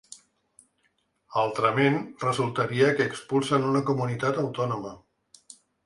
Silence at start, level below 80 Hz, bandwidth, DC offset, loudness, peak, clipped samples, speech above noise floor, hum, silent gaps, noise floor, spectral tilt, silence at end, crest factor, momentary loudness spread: 0.1 s; -66 dBFS; 11.5 kHz; under 0.1%; -26 LUFS; -8 dBFS; under 0.1%; 46 dB; none; none; -71 dBFS; -6 dB/octave; 0.9 s; 18 dB; 7 LU